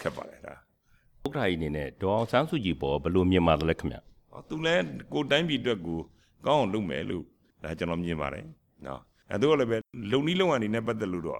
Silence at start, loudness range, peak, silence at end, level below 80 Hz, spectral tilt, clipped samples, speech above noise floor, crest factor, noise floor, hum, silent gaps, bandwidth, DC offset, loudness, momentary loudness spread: 0 s; 4 LU; -10 dBFS; 0 s; -50 dBFS; -6.5 dB/octave; under 0.1%; 37 dB; 20 dB; -65 dBFS; none; none; 14 kHz; under 0.1%; -28 LUFS; 17 LU